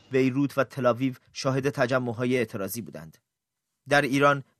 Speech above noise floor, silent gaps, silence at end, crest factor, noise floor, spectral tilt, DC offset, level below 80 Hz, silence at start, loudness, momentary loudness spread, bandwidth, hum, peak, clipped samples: 58 dB; none; 0.2 s; 20 dB; -84 dBFS; -5.5 dB/octave; under 0.1%; -68 dBFS; 0.1 s; -26 LUFS; 11 LU; 14 kHz; none; -6 dBFS; under 0.1%